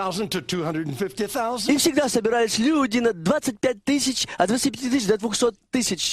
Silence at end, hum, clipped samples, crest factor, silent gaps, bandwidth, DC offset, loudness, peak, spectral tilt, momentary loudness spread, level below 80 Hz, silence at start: 0 s; none; under 0.1%; 18 dB; none; 15 kHz; under 0.1%; -22 LUFS; -4 dBFS; -3.5 dB/octave; 6 LU; -56 dBFS; 0 s